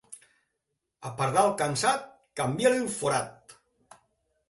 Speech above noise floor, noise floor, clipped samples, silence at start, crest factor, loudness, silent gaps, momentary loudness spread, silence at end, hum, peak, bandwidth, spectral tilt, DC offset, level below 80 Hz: 55 dB; -82 dBFS; under 0.1%; 0.1 s; 22 dB; -27 LUFS; none; 17 LU; 1 s; none; -8 dBFS; 12 kHz; -4 dB/octave; under 0.1%; -66 dBFS